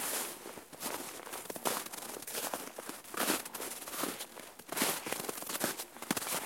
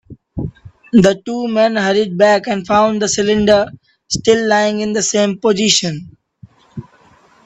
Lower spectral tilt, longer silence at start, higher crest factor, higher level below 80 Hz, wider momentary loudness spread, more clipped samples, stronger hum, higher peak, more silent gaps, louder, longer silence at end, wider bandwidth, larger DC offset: second, -1.5 dB/octave vs -4 dB/octave; about the same, 0 s vs 0.1 s; first, 26 dB vs 16 dB; second, -78 dBFS vs -46 dBFS; second, 10 LU vs 17 LU; neither; neither; second, -14 dBFS vs 0 dBFS; neither; second, -37 LUFS vs -14 LUFS; second, 0 s vs 0.65 s; first, 17 kHz vs 8.4 kHz; neither